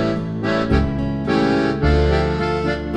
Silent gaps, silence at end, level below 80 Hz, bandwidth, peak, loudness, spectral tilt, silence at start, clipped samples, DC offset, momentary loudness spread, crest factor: none; 0 s; -26 dBFS; 8.8 kHz; -4 dBFS; -19 LUFS; -7.5 dB/octave; 0 s; under 0.1%; under 0.1%; 5 LU; 14 dB